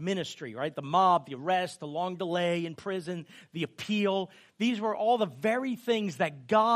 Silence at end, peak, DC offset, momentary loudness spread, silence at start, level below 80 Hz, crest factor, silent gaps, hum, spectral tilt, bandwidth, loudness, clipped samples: 0 s; -12 dBFS; under 0.1%; 11 LU; 0 s; -78 dBFS; 18 dB; none; none; -5.5 dB/octave; 15 kHz; -30 LUFS; under 0.1%